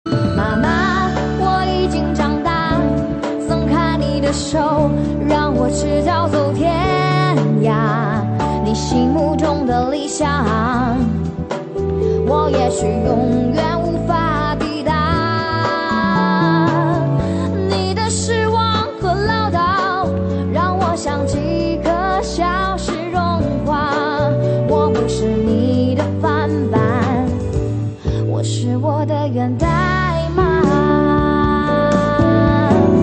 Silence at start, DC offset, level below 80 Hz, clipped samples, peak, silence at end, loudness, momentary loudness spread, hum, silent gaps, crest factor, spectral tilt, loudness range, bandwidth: 0.05 s; under 0.1%; -30 dBFS; under 0.1%; -2 dBFS; 0 s; -17 LUFS; 4 LU; none; none; 14 dB; -6.5 dB/octave; 2 LU; 8.8 kHz